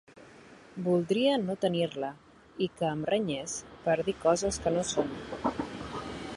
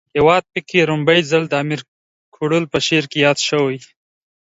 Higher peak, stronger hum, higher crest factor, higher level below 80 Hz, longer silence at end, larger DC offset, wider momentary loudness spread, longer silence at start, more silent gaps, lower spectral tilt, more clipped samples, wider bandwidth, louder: second, -12 dBFS vs 0 dBFS; neither; about the same, 20 dB vs 18 dB; about the same, -56 dBFS vs -52 dBFS; second, 0 s vs 0.55 s; neither; about the same, 11 LU vs 9 LU; about the same, 0.1 s vs 0.15 s; second, none vs 1.88-2.32 s; about the same, -4.5 dB/octave vs -4.5 dB/octave; neither; first, 11.5 kHz vs 8 kHz; second, -31 LUFS vs -16 LUFS